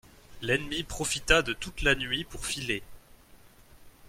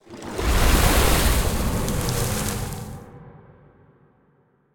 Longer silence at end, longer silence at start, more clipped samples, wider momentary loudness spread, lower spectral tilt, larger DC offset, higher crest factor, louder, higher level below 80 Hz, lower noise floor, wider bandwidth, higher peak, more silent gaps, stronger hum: second, 0.2 s vs 1.35 s; first, 0.3 s vs 0.1 s; neither; second, 10 LU vs 17 LU; second, -2.5 dB/octave vs -4 dB/octave; neither; first, 24 dB vs 18 dB; second, -29 LUFS vs -22 LUFS; second, -44 dBFS vs -26 dBFS; second, -55 dBFS vs -62 dBFS; about the same, 16.5 kHz vs 18 kHz; second, -8 dBFS vs -4 dBFS; neither; neither